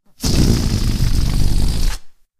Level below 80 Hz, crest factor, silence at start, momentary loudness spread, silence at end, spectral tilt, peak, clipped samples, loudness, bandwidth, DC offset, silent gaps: -18 dBFS; 14 dB; 0.2 s; 8 LU; 0.3 s; -5 dB/octave; -2 dBFS; under 0.1%; -19 LUFS; 15.5 kHz; under 0.1%; none